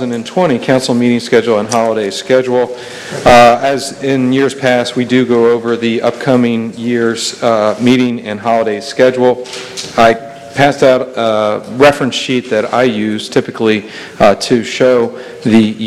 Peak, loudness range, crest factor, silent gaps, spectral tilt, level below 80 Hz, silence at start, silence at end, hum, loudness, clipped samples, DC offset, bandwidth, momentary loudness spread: 0 dBFS; 2 LU; 12 dB; none; -5 dB/octave; -44 dBFS; 0 s; 0 s; none; -12 LUFS; 0.9%; under 0.1%; 14 kHz; 8 LU